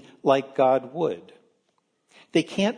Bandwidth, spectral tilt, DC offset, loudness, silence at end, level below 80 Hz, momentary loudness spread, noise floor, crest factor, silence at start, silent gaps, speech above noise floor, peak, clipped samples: 10.5 kHz; -5.5 dB/octave; under 0.1%; -24 LUFS; 0 s; -70 dBFS; 7 LU; -72 dBFS; 20 dB; 0.25 s; none; 49 dB; -6 dBFS; under 0.1%